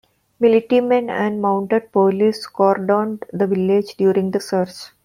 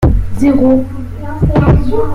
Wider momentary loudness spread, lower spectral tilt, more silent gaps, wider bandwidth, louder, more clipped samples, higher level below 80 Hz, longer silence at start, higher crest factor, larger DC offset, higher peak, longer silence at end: second, 6 LU vs 14 LU; second, -7 dB/octave vs -9.5 dB/octave; neither; first, 15 kHz vs 13 kHz; second, -18 LUFS vs -12 LUFS; neither; second, -64 dBFS vs -18 dBFS; first, 0.4 s vs 0 s; first, 16 dB vs 10 dB; neither; about the same, -2 dBFS vs 0 dBFS; first, 0.15 s vs 0 s